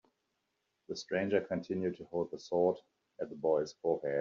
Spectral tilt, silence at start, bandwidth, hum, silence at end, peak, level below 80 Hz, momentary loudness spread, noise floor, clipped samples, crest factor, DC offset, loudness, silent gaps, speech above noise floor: -5 dB/octave; 0.9 s; 7.4 kHz; none; 0 s; -16 dBFS; -76 dBFS; 12 LU; -83 dBFS; under 0.1%; 18 dB; under 0.1%; -35 LUFS; none; 49 dB